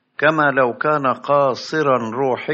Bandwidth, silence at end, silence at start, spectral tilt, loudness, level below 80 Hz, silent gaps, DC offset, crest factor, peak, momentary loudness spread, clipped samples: 7.6 kHz; 0 s; 0.2 s; -4 dB/octave; -18 LUFS; -68 dBFS; none; under 0.1%; 16 dB; -2 dBFS; 4 LU; under 0.1%